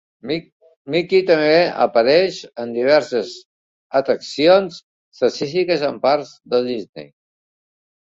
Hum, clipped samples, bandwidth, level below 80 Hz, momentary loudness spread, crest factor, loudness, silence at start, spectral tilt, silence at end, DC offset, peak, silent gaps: none; under 0.1%; 7.8 kHz; -62 dBFS; 14 LU; 16 dB; -18 LUFS; 0.25 s; -5 dB/octave; 1.15 s; under 0.1%; -2 dBFS; 0.52-0.60 s, 0.76-0.85 s, 3.45-3.90 s, 4.83-5.12 s, 6.89-6.93 s